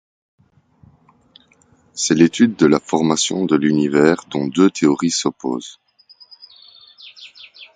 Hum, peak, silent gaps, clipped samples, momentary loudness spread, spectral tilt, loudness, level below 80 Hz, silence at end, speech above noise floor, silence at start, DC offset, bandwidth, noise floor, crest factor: none; 0 dBFS; none; under 0.1%; 23 LU; -4.5 dB/octave; -17 LUFS; -58 dBFS; 0.1 s; 39 dB; 1.95 s; under 0.1%; 9.4 kHz; -55 dBFS; 18 dB